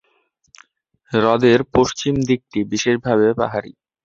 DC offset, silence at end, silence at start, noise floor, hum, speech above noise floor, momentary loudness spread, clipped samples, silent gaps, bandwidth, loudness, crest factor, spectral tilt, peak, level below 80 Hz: under 0.1%; 0.35 s; 1.1 s; -64 dBFS; none; 47 dB; 8 LU; under 0.1%; none; 7.6 kHz; -18 LUFS; 18 dB; -5.5 dB/octave; -2 dBFS; -48 dBFS